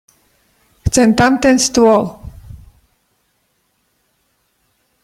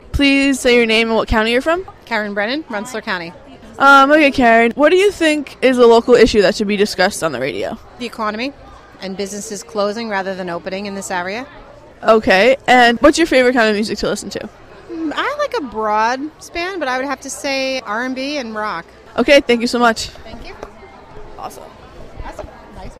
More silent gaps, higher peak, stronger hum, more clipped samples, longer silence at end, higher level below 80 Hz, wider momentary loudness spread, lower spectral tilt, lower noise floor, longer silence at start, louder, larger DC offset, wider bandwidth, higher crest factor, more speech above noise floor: neither; about the same, 0 dBFS vs 0 dBFS; neither; neither; first, 2.5 s vs 0.05 s; about the same, -36 dBFS vs -38 dBFS; second, 18 LU vs 21 LU; about the same, -4 dB/octave vs -4 dB/octave; first, -64 dBFS vs -38 dBFS; first, 0.85 s vs 0.1 s; first, -12 LUFS vs -15 LUFS; neither; about the same, 15.5 kHz vs 15.5 kHz; about the same, 16 dB vs 16 dB; first, 53 dB vs 23 dB